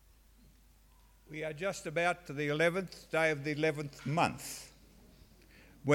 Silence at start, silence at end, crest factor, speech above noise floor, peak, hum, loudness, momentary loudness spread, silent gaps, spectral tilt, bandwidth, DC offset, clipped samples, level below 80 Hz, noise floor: 1.3 s; 0 s; 22 dB; 28 dB; -14 dBFS; none; -34 LUFS; 12 LU; none; -5 dB/octave; 17 kHz; under 0.1%; under 0.1%; -64 dBFS; -63 dBFS